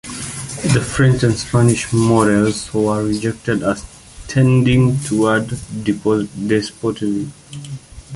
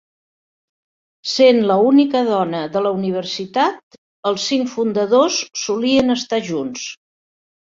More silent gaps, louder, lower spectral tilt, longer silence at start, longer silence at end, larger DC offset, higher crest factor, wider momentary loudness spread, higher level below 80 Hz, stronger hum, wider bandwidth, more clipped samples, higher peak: second, none vs 3.83-3.91 s, 3.98-4.23 s; about the same, -17 LUFS vs -17 LUFS; first, -6 dB/octave vs -4 dB/octave; second, 0.05 s vs 1.25 s; second, 0 s vs 0.8 s; neither; about the same, 16 dB vs 16 dB; first, 14 LU vs 11 LU; first, -40 dBFS vs -60 dBFS; neither; first, 11.5 kHz vs 7.6 kHz; neither; about the same, -2 dBFS vs -2 dBFS